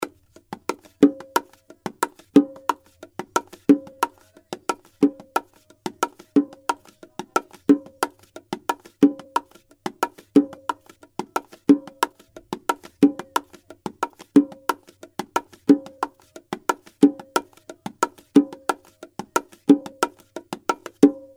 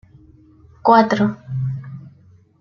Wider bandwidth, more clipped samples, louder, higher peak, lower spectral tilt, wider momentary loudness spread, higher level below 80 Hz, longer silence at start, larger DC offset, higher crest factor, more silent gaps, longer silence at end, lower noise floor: first, 17 kHz vs 7 kHz; neither; second, -23 LUFS vs -17 LUFS; about the same, 0 dBFS vs -2 dBFS; second, -5 dB/octave vs -7.5 dB/octave; second, 17 LU vs 21 LU; second, -68 dBFS vs -54 dBFS; second, 0 s vs 0.85 s; neither; about the same, 24 dB vs 20 dB; neither; second, 0.2 s vs 0.5 s; second, -41 dBFS vs -50 dBFS